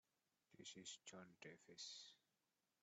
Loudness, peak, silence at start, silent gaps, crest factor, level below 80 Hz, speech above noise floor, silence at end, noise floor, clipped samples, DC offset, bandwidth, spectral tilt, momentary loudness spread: -59 LUFS; -44 dBFS; 0.5 s; none; 20 dB; under -90 dBFS; over 30 dB; 0.65 s; under -90 dBFS; under 0.1%; under 0.1%; 8.2 kHz; -2 dB/octave; 7 LU